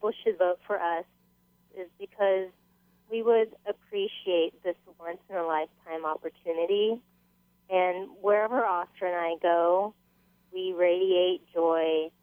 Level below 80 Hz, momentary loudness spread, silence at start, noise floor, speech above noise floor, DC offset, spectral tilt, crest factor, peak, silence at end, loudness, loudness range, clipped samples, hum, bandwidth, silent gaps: -78 dBFS; 13 LU; 0 s; -67 dBFS; 39 dB; under 0.1%; -6.5 dB/octave; 16 dB; -12 dBFS; 0.15 s; -28 LUFS; 4 LU; under 0.1%; 60 Hz at -70 dBFS; 16 kHz; none